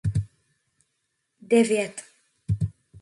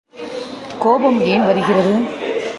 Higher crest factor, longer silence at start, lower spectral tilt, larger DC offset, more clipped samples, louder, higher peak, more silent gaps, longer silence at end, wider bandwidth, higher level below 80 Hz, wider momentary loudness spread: about the same, 20 dB vs 16 dB; about the same, 0.05 s vs 0.15 s; about the same, -6.5 dB/octave vs -6.5 dB/octave; neither; neither; second, -25 LUFS vs -15 LUFS; second, -8 dBFS vs 0 dBFS; neither; about the same, 0 s vs 0 s; about the same, 11.5 kHz vs 11.5 kHz; first, -46 dBFS vs -56 dBFS; first, 21 LU vs 14 LU